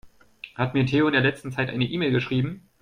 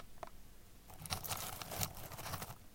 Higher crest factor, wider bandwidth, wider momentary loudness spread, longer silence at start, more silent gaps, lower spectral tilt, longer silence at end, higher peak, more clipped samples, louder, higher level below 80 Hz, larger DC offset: second, 16 dB vs 28 dB; second, 10.5 kHz vs 17 kHz; second, 10 LU vs 19 LU; about the same, 0.05 s vs 0 s; neither; first, -7.5 dB/octave vs -2.5 dB/octave; first, 0.2 s vs 0 s; first, -8 dBFS vs -18 dBFS; neither; first, -24 LUFS vs -44 LUFS; about the same, -54 dBFS vs -58 dBFS; neither